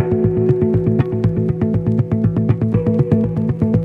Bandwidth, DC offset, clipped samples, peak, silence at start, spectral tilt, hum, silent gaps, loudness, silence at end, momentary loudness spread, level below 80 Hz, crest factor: 4 kHz; under 0.1%; under 0.1%; 0 dBFS; 0 s; -11.5 dB/octave; none; none; -17 LUFS; 0 s; 2 LU; -36 dBFS; 16 dB